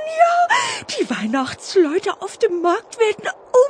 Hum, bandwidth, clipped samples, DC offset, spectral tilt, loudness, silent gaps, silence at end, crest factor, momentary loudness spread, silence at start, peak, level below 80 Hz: none; 10.5 kHz; under 0.1%; under 0.1%; -3 dB/octave; -19 LUFS; none; 0 s; 16 dB; 7 LU; 0 s; -2 dBFS; -64 dBFS